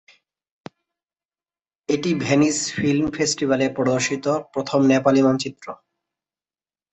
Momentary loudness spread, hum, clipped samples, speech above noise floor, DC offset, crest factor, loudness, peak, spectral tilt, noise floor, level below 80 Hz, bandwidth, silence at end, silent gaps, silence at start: 9 LU; none; under 0.1%; over 70 dB; under 0.1%; 20 dB; -20 LUFS; -2 dBFS; -4.5 dB/octave; under -90 dBFS; -58 dBFS; 8.4 kHz; 1.15 s; none; 1.9 s